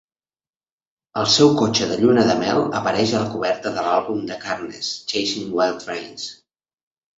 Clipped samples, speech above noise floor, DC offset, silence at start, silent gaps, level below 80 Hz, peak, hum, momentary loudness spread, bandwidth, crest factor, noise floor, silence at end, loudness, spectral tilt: under 0.1%; over 70 dB; under 0.1%; 1.15 s; none; -56 dBFS; -2 dBFS; none; 14 LU; 8 kHz; 18 dB; under -90 dBFS; 0.85 s; -20 LUFS; -4 dB/octave